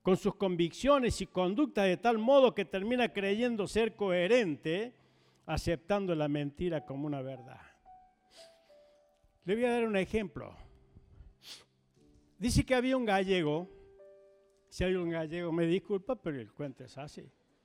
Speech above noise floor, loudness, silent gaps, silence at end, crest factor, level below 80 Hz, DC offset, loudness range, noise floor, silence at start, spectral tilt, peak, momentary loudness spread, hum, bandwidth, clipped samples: 37 dB; -32 LUFS; none; 0.4 s; 20 dB; -52 dBFS; under 0.1%; 8 LU; -68 dBFS; 0.05 s; -6 dB/octave; -14 dBFS; 19 LU; none; 15.5 kHz; under 0.1%